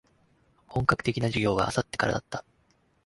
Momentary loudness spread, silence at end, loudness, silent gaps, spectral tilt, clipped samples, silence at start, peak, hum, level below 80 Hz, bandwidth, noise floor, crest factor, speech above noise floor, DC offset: 10 LU; 0.65 s; -27 LUFS; none; -5.5 dB/octave; under 0.1%; 0.7 s; -6 dBFS; none; -50 dBFS; 11.5 kHz; -67 dBFS; 24 dB; 40 dB; under 0.1%